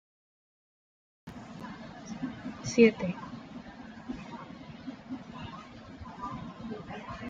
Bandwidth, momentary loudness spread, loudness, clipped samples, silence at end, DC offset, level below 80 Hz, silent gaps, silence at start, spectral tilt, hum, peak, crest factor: 7.8 kHz; 23 LU; -33 LUFS; under 0.1%; 0 s; under 0.1%; -60 dBFS; none; 1.25 s; -5.5 dB/octave; none; -10 dBFS; 26 dB